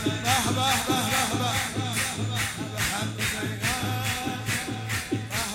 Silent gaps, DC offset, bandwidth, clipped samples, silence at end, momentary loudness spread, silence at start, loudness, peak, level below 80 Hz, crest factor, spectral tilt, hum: none; under 0.1%; 16.5 kHz; under 0.1%; 0 s; 6 LU; 0 s; -26 LUFS; -10 dBFS; -48 dBFS; 18 dB; -3 dB/octave; none